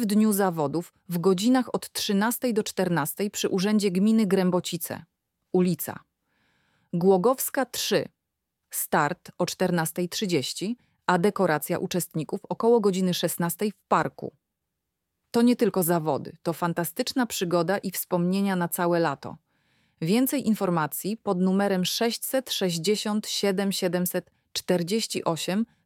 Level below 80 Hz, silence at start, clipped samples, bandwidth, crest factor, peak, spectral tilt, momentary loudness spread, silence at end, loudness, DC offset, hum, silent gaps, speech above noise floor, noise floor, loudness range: -70 dBFS; 0 s; under 0.1%; 18 kHz; 18 dB; -8 dBFS; -5 dB/octave; 10 LU; 0.2 s; -26 LUFS; under 0.1%; none; none; 57 dB; -82 dBFS; 2 LU